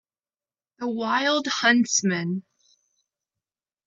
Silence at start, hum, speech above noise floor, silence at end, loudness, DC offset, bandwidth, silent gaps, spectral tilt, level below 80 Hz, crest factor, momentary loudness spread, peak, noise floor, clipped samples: 0.8 s; none; over 67 dB; 1.45 s; -23 LUFS; under 0.1%; 8 kHz; none; -3 dB/octave; -78 dBFS; 20 dB; 12 LU; -8 dBFS; under -90 dBFS; under 0.1%